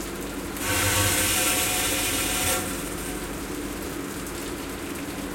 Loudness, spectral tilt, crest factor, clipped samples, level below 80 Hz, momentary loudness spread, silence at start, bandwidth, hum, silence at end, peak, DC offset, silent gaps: -25 LUFS; -2.5 dB/octave; 18 dB; under 0.1%; -42 dBFS; 12 LU; 0 s; 17 kHz; none; 0 s; -10 dBFS; under 0.1%; none